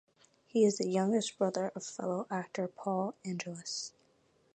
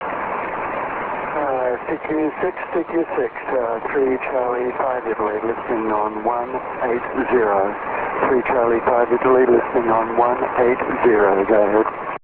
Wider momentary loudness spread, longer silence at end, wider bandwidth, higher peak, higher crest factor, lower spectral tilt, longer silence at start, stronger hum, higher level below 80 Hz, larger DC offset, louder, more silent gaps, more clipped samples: about the same, 10 LU vs 9 LU; first, 0.65 s vs 0.05 s; first, 9.2 kHz vs 4 kHz; second, -16 dBFS vs -4 dBFS; about the same, 20 dB vs 16 dB; second, -5 dB/octave vs -10 dB/octave; first, 0.55 s vs 0 s; neither; second, -84 dBFS vs -50 dBFS; neither; second, -34 LUFS vs -19 LUFS; neither; neither